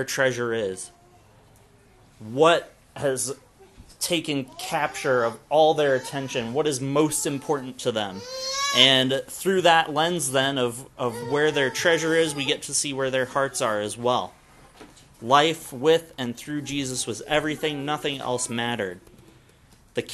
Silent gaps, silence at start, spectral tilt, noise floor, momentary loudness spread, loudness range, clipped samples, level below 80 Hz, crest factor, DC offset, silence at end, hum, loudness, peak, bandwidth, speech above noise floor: none; 0 s; -3 dB/octave; -55 dBFS; 11 LU; 6 LU; under 0.1%; -60 dBFS; 24 dB; under 0.1%; 0 s; none; -23 LUFS; 0 dBFS; 13 kHz; 31 dB